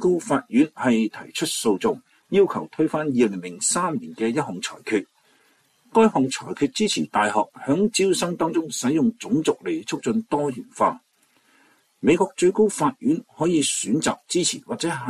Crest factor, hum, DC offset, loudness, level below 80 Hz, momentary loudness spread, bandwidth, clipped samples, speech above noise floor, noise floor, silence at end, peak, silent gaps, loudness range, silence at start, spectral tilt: 16 dB; none; under 0.1%; -22 LUFS; -64 dBFS; 7 LU; 14 kHz; under 0.1%; 40 dB; -62 dBFS; 0 s; -6 dBFS; none; 3 LU; 0 s; -4 dB/octave